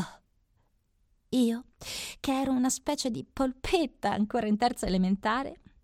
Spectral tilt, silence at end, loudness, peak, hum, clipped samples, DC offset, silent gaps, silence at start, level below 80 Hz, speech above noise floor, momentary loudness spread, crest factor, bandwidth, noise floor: -4.5 dB/octave; 0.3 s; -29 LUFS; -12 dBFS; none; under 0.1%; under 0.1%; none; 0 s; -50 dBFS; 42 dB; 9 LU; 18 dB; 16 kHz; -70 dBFS